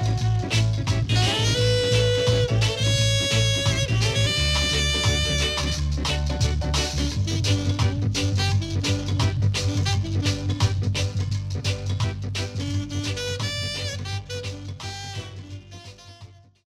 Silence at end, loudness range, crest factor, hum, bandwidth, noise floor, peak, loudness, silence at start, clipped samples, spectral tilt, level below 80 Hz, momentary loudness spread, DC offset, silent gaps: 0.35 s; 8 LU; 14 dB; none; 13.5 kHz; -47 dBFS; -10 dBFS; -23 LUFS; 0 s; under 0.1%; -4.5 dB/octave; -34 dBFS; 12 LU; under 0.1%; none